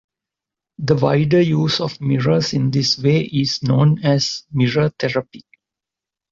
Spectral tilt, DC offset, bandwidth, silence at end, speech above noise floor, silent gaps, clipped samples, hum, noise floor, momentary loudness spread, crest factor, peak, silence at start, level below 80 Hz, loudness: -6 dB/octave; under 0.1%; 7.6 kHz; 0.9 s; 70 dB; none; under 0.1%; none; -87 dBFS; 6 LU; 16 dB; -2 dBFS; 0.8 s; -52 dBFS; -18 LUFS